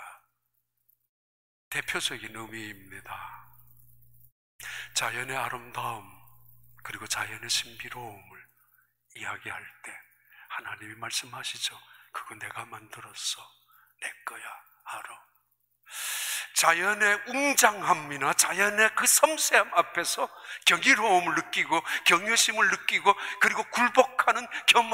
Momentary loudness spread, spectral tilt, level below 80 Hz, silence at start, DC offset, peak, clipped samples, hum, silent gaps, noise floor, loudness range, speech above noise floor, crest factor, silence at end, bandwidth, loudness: 20 LU; -0.5 dB/octave; -72 dBFS; 0 s; under 0.1%; -4 dBFS; under 0.1%; 60 Hz at -65 dBFS; 1.09-1.71 s, 4.32-4.59 s; -78 dBFS; 15 LU; 50 dB; 26 dB; 0 s; 16 kHz; -25 LUFS